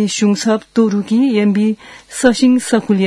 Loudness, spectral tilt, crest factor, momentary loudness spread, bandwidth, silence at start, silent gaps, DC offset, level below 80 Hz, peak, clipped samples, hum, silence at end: -14 LUFS; -5 dB/octave; 14 dB; 5 LU; 12 kHz; 0 s; none; under 0.1%; -52 dBFS; 0 dBFS; under 0.1%; none; 0 s